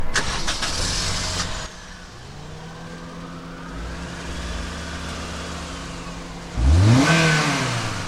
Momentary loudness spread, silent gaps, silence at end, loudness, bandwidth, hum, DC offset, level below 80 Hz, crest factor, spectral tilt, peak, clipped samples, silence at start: 21 LU; none; 0 s; -22 LUFS; 15 kHz; none; under 0.1%; -32 dBFS; 18 dB; -4 dB/octave; -4 dBFS; under 0.1%; 0 s